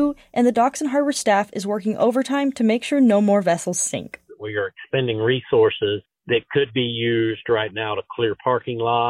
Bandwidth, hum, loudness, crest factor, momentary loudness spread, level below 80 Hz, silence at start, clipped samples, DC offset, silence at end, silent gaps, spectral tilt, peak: 15.5 kHz; none; -21 LUFS; 14 dB; 8 LU; -60 dBFS; 0 s; under 0.1%; under 0.1%; 0 s; none; -4.5 dB/octave; -6 dBFS